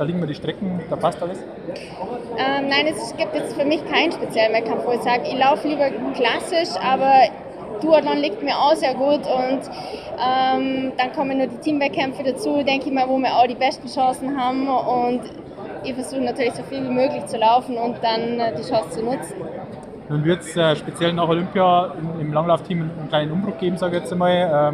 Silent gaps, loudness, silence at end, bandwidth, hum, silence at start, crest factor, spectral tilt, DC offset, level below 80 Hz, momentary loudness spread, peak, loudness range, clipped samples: none; -20 LUFS; 0 s; 13 kHz; none; 0 s; 18 dB; -5.5 dB/octave; under 0.1%; -56 dBFS; 11 LU; -2 dBFS; 4 LU; under 0.1%